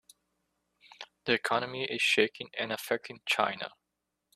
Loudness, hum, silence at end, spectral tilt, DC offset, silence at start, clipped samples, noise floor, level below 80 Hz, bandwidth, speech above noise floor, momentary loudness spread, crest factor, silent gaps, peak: -30 LUFS; none; 0.7 s; -3 dB/octave; under 0.1%; 1 s; under 0.1%; -84 dBFS; -76 dBFS; 14.5 kHz; 53 dB; 15 LU; 26 dB; none; -8 dBFS